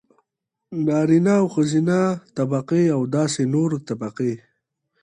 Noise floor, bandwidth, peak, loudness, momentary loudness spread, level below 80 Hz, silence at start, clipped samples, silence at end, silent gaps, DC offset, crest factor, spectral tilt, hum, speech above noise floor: -82 dBFS; 11 kHz; -6 dBFS; -21 LUFS; 9 LU; -64 dBFS; 0.7 s; under 0.1%; 0.65 s; none; under 0.1%; 14 dB; -7 dB/octave; none; 62 dB